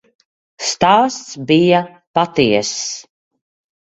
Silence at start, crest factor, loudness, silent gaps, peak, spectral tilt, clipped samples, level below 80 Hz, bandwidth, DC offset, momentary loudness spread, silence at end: 0.6 s; 18 dB; -15 LUFS; 2.07-2.14 s; 0 dBFS; -4 dB/octave; under 0.1%; -54 dBFS; 8.4 kHz; under 0.1%; 11 LU; 0.95 s